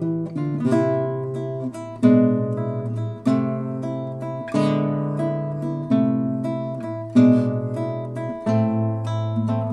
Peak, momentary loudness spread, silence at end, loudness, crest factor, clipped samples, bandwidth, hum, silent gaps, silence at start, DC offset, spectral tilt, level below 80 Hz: -4 dBFS; 11 LU; 0 s; -22 LUFS; 18 dB; under 0.1%; 10.5 kHz; none; none; 0 s; under 0.1%; -9 dB/octave; -60 dBFS